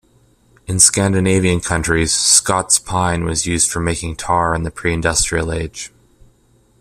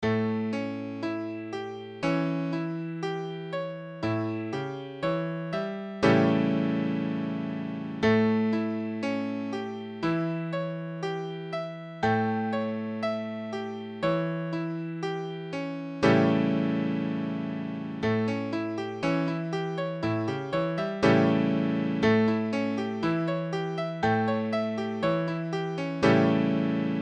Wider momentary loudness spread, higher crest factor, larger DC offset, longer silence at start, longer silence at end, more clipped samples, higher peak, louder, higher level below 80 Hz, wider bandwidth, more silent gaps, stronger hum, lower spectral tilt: about the same, 12 LU vs 11 LU; about the same, 18 dB vs 18 dB; neither; first, 0.7 s vs 0 s; first, 0.95 s vs 0 s; neither; first, 0 dBFS vs -10 dBFS; first, -15 LUFS vs -28 LUFS; first, -36 dBFS vs -62 dBFS; first, 15.5 kHz vs 8.6 kHz; neither; neither; second, -3 dB/octave vs -7.5 dB/octave